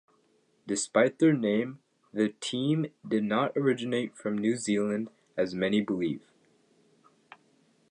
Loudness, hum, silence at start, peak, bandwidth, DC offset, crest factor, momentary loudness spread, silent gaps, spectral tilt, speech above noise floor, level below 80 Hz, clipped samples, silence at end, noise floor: -29 LUFS; none; 0.65 s; -10 dBFS; 11 kHz; under 0.1%; 20 dB; 9 LU; none; -5 dB/octave; 41 dB; -72 dBFS; under 0.1%; 1.7 s; -68 dBFS